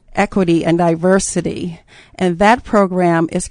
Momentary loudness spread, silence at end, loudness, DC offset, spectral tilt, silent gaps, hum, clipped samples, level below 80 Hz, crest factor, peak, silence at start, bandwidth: 8 LU; 0 s; -15 LUFS; under 0.1%; -5.5 dB/octave; none; none; under 0.1%; -40 dBFS; 16 dB; 0 dBFS; 0.15 s; 10.5 kHz